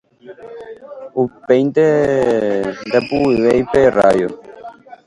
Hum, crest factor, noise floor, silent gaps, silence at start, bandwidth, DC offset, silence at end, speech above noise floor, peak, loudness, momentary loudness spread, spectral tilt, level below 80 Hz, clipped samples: none; 16 dB; -36 dBFS; none; 0.25 s; 11.5 kHz; under 0.1%; 0.1 s; 21 dB; 0 dBFS; -15 LUFS; 21 LU; -7 dB/octave; -46 dBFS; under 0.1%